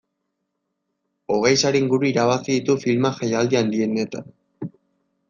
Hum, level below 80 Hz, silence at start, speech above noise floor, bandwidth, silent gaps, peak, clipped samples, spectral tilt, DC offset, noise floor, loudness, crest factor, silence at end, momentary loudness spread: none; -62 dBFS; 1.3 s; 57 dB; 7.6 kHz; none; -4 dBFS; under 0.1%; -5 dB/octave; under 0.1%; -77 dBFS; -20 LUFS; 18 dB; 0.6 s; 18 LU